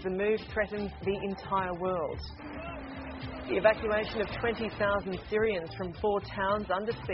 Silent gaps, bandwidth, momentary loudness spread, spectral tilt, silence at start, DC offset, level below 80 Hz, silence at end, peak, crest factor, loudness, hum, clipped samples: none; 5.8 kHz; 12 LU; -4 dB/octave; 0 s; under 0.1%; -50 dBFS; 0 s; -8 dBFS; 22 dB; -32 LUFS; none; under 0.1%